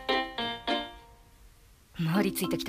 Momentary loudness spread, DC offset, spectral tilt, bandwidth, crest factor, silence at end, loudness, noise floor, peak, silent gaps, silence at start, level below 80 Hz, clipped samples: 11 LU; under 0.1%; -4.5 dB/octave; 15.5 kHz; 18 dB; 0 s; -30 LUFS; -57 dBFS; -14 dBFS; none; 0 s; -56 dBFS; under 0.1%